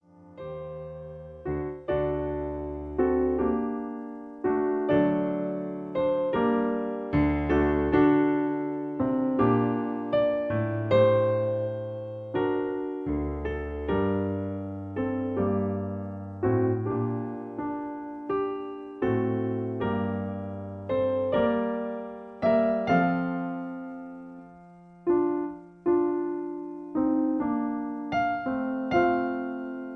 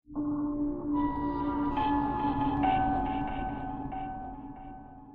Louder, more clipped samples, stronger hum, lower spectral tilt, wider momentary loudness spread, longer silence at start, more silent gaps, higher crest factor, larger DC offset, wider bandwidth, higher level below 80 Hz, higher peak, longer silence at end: first, -28 LUFS vs -31 LUFS; neither; neither; about the same, -9.5 dB/octave vs -9.5 dB/octave; about the same, 13 LU vs 15 LU; about the same, 0.2 s vs 0.1 s; neither; about the same, 18 dB vs 16 dB; neither; first, 6.2 kHz vs 4.5 kHz; about the same, -46 dBFS vs -44 dBFS; first, -10 dBFS vs -16 dBFS; about the same, 0 s vs 0 s